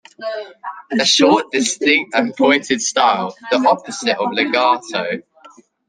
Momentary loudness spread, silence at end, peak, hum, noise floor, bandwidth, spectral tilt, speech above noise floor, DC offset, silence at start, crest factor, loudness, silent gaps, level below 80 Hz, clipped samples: 14 LU; 0.7 s; 0 dBFS; none; -46 dBFS; 10.5 kHz; -2 dB/octave; 30 dB; under 0.1%; 0.2 s; 16 dB; -16 LUFS; none; -64 dBFS; under 0.1%